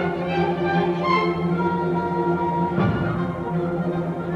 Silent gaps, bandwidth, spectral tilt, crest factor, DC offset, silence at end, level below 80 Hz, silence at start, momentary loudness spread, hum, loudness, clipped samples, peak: none; 6.8 kHz; -8.5 dB/octave; 14 dB; under 0.1%; 0 s; -48 dBFS; 0 s; 5 LU; none; -23 LUFS; under 0.1%; -8 dBFS